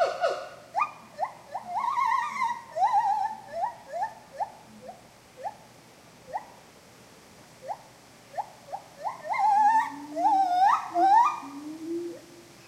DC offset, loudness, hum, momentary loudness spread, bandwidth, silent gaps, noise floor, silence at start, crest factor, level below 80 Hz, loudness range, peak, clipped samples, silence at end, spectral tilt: under 0.1%; -27 LUFS; none; 18 LU; 15 kHz; none; -53 dBFS; 0 s; 18 dB; -72 dBFS; 18 LU; -12 dBFS; under 0.1%; 0.15 s; -3.5 dB/octave